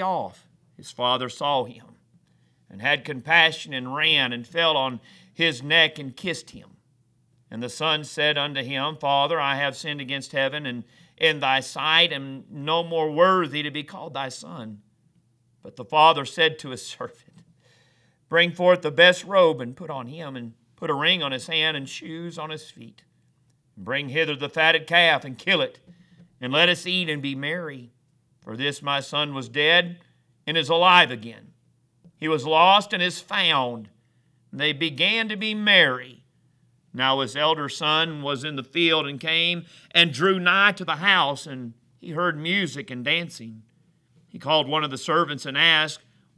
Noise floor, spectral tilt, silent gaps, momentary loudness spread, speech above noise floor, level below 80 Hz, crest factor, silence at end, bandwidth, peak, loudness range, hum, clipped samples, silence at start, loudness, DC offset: -64 dBFS; -4 dB/octave; none; 18 LU; 41 dB; -74 dBFS; 24 dB; 0.4 s; 11 kHz; 0 dBFS; 5 LU; none; under 0.1%; 0 s; -21 LUFS; under 0.1%